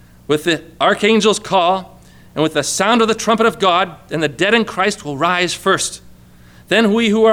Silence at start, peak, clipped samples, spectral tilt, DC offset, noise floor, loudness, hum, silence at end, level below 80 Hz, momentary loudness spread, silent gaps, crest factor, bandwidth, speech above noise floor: 0.3 s; -2 dBFS; under 0.1%; -3.5 dB/octave; under 0.1%; -43 dBFS; -15 LUFS; none; 0 s; -50 dBFS; 8 LU; none; 14 dB; 17 kHz; 28 dB